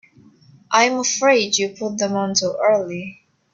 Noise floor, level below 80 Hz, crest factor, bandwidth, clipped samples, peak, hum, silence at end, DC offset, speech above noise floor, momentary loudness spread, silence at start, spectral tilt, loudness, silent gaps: -50 dBFS; -66 dBFS; 18 dB; 8 kHz; under 0.1%; -2 dBFS; none; 0.4 s; under 0.1%; 31 dB; 10 LU; 0.7 s; -2.5 dB/octave; -18 LUFS; none